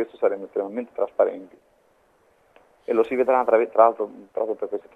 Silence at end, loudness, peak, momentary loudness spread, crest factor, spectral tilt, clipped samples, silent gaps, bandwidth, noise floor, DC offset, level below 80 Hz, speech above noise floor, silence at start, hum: 0.15 s; -23 LUFS; -2 dBFS; 12 LU; 22 dB; -7 dB/octave; under 0.1%; none; 4 kHz; -61 dBFS; under 0.1%; -70 dBFS; 39 dB; 0 s; none